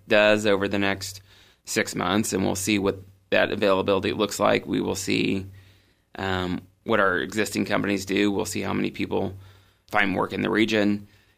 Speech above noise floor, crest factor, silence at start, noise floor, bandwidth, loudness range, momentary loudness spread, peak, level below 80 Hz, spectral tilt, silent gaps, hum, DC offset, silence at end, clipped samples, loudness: 34 dB; 20 dB; 0.05 s; -58 dBFS; 15.5 kHz; 2 LU; 10 LU; -4 dBFS; -58 dBFS; -4.5 dB/octave; none; none; under 0.1%; 0.35 s; under 0.1%; -24 LUFS